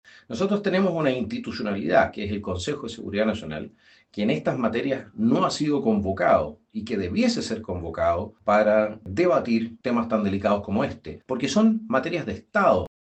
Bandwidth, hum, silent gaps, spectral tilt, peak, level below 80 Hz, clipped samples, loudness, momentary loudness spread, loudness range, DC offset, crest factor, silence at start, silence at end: 8.8 kHz; none; none; -6 dB/octave; -6 dBFS; -58 dBFS; under 0.1%; -24 LUFS; 10 LU; 3 LU; under 0.1%; 18 dB; 0.3 s; 0.15 s